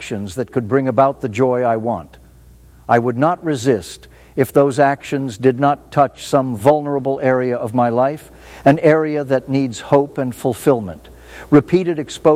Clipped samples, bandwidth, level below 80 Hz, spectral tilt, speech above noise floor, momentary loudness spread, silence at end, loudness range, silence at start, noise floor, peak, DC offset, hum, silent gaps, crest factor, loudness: under 0.1%; 16 kHz; -50 dBFS; -7 dB/octave; 28 dB; 9 LU; 0 s; 2 LU; 0 s; -44 dBFS; 0 dBFS; under 0.1%; none; none; 16 dB; -17 LUFS